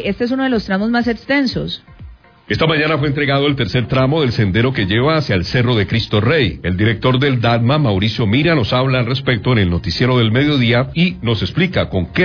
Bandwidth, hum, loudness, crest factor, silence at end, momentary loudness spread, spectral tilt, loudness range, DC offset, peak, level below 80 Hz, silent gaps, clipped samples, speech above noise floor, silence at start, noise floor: 5.4 kHz; none; -15 LUFS; 12 dB; 0 s; 4 LU; -7.5 dB/octave; 2 LU; under 0.1%; -2 dBFS; -38 dBFS; none; under 0.1%; 23 dB; 0 s; -38 dBFS